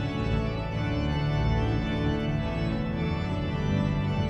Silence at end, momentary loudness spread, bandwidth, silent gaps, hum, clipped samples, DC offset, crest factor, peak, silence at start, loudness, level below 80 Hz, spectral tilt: 0 s; 3 LU; 8.4 kHz; none; none; under 0.1%; under 0.1%; 14 dB; -14 dBFS; 0 s; -28 LUFS; -36 dBFS; -8 dB/octave